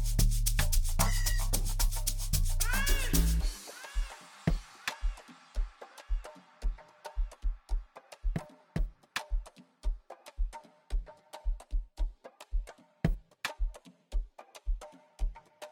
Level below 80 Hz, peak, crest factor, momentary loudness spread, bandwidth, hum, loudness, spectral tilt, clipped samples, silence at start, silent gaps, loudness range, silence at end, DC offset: -34 dBFS; -12 dBFS; 20 dB; 17 LU; 19 kHz; none; -36 LUFS; -3.5 dB/octave; under 0.1%; 0 s; none; 11 LU; 0.05 s; under 0.1%